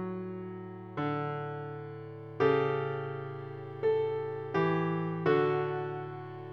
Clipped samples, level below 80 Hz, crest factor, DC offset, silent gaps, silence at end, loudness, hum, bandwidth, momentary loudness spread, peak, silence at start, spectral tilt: under 0.1%; -72 dBFS; 18 dB; under 0.1%; none; 0 s; -33 LUFS; none; 6 kHz; 14 LU; -14 dBFS; 0 s; -9 dB/octave